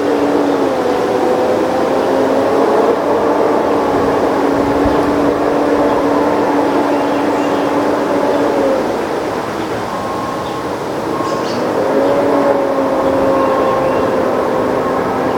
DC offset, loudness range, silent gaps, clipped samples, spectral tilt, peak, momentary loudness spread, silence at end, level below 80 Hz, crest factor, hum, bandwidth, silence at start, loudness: under 0.1%; 4 LU; none; under 0.1%; -6 dB/octave; 0 dBFS; 6 LU; 0 s; -42 dBFS; 14 dB; none; 18 kHz; 0 s; -14 LUFS